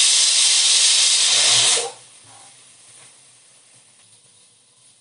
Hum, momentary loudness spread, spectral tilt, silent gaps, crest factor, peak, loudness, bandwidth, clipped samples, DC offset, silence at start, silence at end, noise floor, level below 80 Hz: none; 5 LU; 3 dB/octave; none; 18 dB; -2 dBFS; -13 LUFS; 11.5 kHz; under 0.1%; under 0.1%; 0 s; 3.05 s; -54 dBFS; -82 dBFS